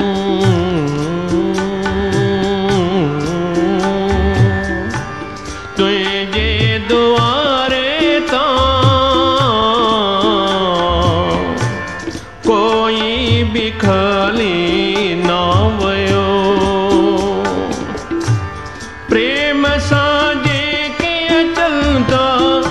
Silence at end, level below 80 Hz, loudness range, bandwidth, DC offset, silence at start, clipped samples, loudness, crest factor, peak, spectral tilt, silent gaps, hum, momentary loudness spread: 0 s; -30 dBFS; 3 LU; 12 kHz; 0.8%; 0 s; under 0.1%; -14 LUFS; 14 dB; 0 dBFS; -5.5 dB/octave; none; none; 7 LU